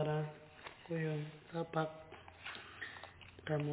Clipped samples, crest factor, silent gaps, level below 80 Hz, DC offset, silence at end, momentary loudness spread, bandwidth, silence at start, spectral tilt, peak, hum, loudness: under 0.1%; 18 dB; none; -70 dBFS; under 0.1%; 0 s; 14 LU; 4 kHz; 0 s; -5.5 dB/octave; -24 dBFS; none; -43 LUFS